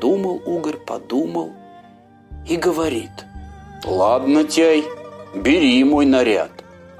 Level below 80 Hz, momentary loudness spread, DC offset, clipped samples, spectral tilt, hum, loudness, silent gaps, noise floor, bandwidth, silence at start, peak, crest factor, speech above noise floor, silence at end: -44 dBFS; 21 LU; under 0.1%; under 0.1%; -4.5 dB/octave; 50 Hz at -50 dBFS; -18 LUFS; none; -46 dBFS; 15 kHz; 0 s; -4 dBFS; 16 dB; 30 dB; 0.5 s